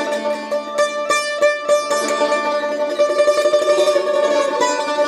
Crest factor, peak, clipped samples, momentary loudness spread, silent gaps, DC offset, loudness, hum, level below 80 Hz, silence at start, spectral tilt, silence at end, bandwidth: 12 dB; -4 dBFS; under 0.1%; 6 LU; none; under 0.1%; -17 LUFS; none; -68 dBFS; 0 s; -1.5 dB/octave; 0 s; 13 kHz